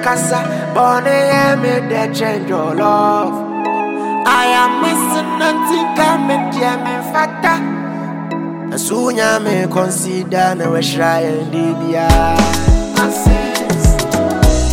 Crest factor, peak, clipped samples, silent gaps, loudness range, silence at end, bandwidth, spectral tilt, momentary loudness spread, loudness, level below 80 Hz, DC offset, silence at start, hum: 14 dB; 0 dBFS; under 0.1%; none; 3 LU; 0 s; 17 kHz; -5 dB/octave; 6 LU; -14 LUFS; -22 dBFS; under 0.1%; 0 s; none